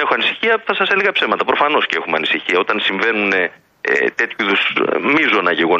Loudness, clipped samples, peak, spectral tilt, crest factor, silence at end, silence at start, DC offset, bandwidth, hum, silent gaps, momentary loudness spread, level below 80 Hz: -15 LUFS; under 0.1%; -2 dBFS; -4.5 dB/octave; 14 dB; 0 s; 0 s; under 0.1%; 8.2 kHz; none; none; 4 LU; -64 dBFS